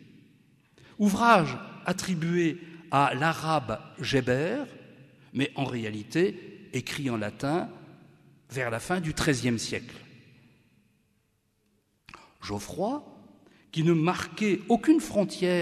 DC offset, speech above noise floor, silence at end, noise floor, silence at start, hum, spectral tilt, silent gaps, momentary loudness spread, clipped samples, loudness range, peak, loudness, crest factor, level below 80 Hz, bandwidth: under 0.1%; 45 dB; 0 s; -72 dBFS; 1 s; none; -5.5 dB/octave; none; 13 LU; under 0.1%; 12 LU; -8 dBFS; -28 LUFS; 22 dB; -58 dBFS; 13.5 kHz